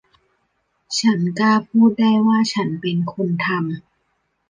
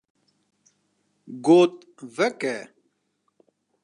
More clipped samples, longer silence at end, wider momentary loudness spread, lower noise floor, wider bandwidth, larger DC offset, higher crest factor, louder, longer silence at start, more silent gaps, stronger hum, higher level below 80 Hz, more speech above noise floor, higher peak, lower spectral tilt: neither; second, 0.7 s vs 1.2 s; second, 9 LU vs 23 LU; second, -69 dBFS vs -73 dBFS; about the same, 9.6 kHz vs 10.5 kHz; neither; about the same, 16 dB vs 20 dB; first, -18 LUFS vs -21 LUFS; second, 0.9 s vs 1.3 s; neither; second, none vs 50 Hz at -65 dBFS; first, -64 dBFS vs -84 dBFS; about the same, 52 dB vs 52 dB; about the same, -4 dBFS vs -6 dBFS; about the same, -5.5 dB/octave vs -5.5 dB/octave